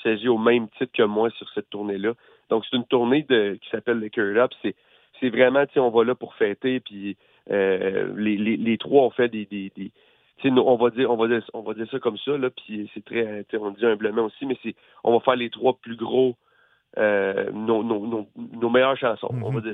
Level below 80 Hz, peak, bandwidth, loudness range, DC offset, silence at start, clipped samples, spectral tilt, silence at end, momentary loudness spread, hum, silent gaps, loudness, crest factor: -70 dBFS; -4 dBFS; 4 kHz; 3 LU; under 0.1%; 0 s; under 0.1%; -9 dB/octave; 0 s; 13 LU; none; none; -23 LUFS; 20 dB